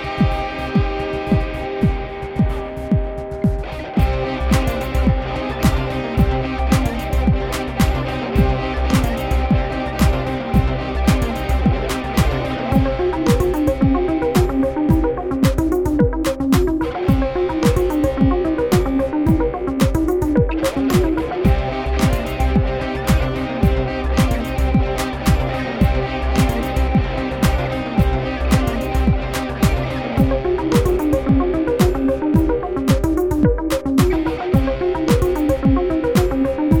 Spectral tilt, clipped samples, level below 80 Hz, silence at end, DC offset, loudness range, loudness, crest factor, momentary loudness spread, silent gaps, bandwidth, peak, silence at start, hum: -7 dB/octave; under 0.1%; -24 dBFS; 0 s; under 0.1%; 2 LU; -19 LUFS; 16 dB; 4 LU; none; over 20 kHz; -2 dBFS; 0 s; none